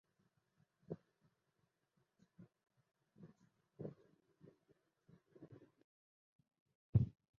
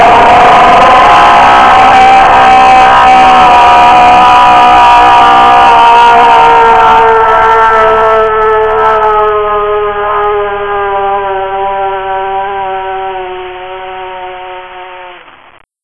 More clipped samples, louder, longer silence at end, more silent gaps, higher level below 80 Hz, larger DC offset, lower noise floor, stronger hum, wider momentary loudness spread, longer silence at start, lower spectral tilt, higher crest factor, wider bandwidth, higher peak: second, under 0.1% vs 9%; second, -44 LUFS vs -4 LUFS; second, 0.3 s vs 0.65 s; first, 5.84-6.39 s, 6.60-6.66 s, 6.75-6.93 s vs none; second, -64 dBFS vs -28 dBFS; neither; first, -85 dBFS vs -39 dBFS; neither; first, 27 LU vs 18 LU; first, 0.9 s vs 0 s; first, -12 dB/octave vs -4 dB/octave; first, 28 dB vs 4 dB; second, 3.3 kHz vs 11 kHz; second, -22 dBFS vs 0 dBFS